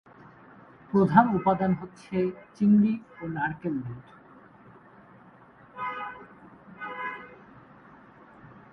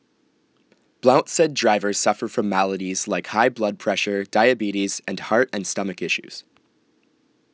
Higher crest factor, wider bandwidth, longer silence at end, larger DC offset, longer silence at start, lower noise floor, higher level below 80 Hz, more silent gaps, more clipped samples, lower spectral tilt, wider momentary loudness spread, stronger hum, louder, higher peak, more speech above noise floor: about the same, 26 dB vs 22 dB; second, 6 kHz vs 8 kHz; second, 0.25 s vs 1.15 s; neither; second, 0.9 s vs 1.05 s; second, -54 dBFS vs -64 dBFS; first, -62 dBFS vs -70 dBFS; neither; neither; first, -9.5 dB/octave vs -3.5 dB/octave; first, 20 LU vs 7 LU; neither; second, -27 LUFS vs -21 LUFS; about the same, -4 dBFS vs -2 dBFS; second, 29 dB vs 43 dB